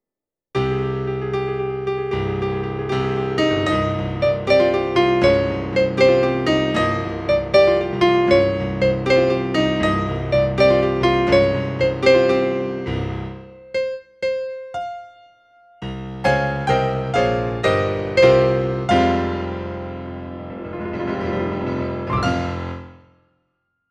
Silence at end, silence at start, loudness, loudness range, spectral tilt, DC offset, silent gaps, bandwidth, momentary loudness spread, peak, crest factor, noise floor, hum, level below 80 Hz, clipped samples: 1 s; 0.55 s; -19 LUFS; 8 LU; -6.5 dB/octave; under 0.1%; none; 9.6 kHz; 14 LU; -2 dBFS; 18 dB; -88 dBFS; none; -40 dBFS; under 0.1%